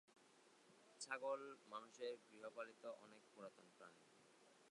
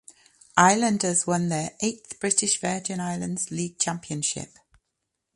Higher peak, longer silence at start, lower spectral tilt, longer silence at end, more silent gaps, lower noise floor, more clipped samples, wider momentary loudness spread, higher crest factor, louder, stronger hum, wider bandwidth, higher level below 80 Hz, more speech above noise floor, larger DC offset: second, -32 dBFS vs -2 dBFS; second, 0.1 s vs 0.55 s; second, -2 dB/octave vs -3.5 dB/octave; second, 0 s vs 0.9 s; neither; second, -73 dBFS vs -81 dBFS; neither; first, 17 LU vs 10 LU; about the same, 24 dB vs 24 dB; second, -54 LUFS vs -24 LUFS; neither; about the same, 11 kHz vs 11.5 kHz; second, under -90 dBFS vs -64 dBFS; second, 18 dB vs 56 dB; neither